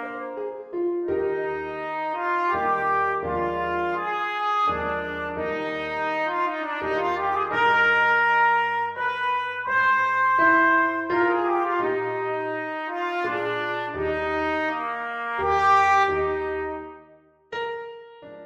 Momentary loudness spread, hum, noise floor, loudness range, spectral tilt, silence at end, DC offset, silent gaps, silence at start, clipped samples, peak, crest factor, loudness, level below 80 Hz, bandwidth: 12 LU; none; -54 dBFS; 5 LU; -5 dB/octave; 0 s; under 0.1%; none; 0 s; under 0.1%; -8 dBFS; 16 dB; -23 LUFS; -52 dBFS; 9 kHz